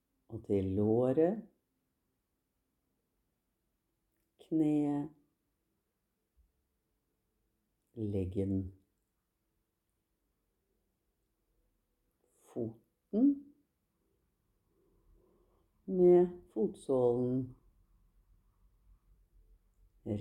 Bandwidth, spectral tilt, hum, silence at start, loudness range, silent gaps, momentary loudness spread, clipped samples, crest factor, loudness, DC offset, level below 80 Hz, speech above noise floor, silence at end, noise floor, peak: 10 kHz; -10 dB/octave; none; 0.3 s; 13 LU; none; 19 LU; under 0.1%; 20 dB; -32 LUFS; under 0.1%; -68 dBFS; 53 dB; 0 s; -84 dBFS; -16 dBFS